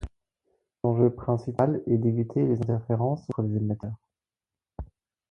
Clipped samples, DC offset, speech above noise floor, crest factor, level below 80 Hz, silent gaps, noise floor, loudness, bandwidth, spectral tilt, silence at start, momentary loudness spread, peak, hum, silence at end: under 0.1%; under 0.1%; over 65 dB; 20 dB; -50 dBFS; none; under -90 dBFS; -27 LUFS; 6.2 kHz; -11 dB/octave; 0 s; 20 LU; -8 dBFS; none; 0.45 s